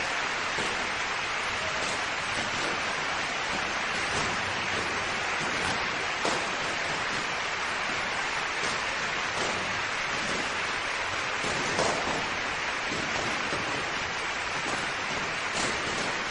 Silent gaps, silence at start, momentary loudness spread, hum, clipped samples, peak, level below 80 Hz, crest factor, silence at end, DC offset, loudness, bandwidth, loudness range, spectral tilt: none; 0 s; 2 LU; none; under 0.1%; -12 dBFS; -54 dBFS; 18 dB; 0 s; under 0.1%; -28 LUFS; 10.5 kHz; 1 LU; -2 dB/octave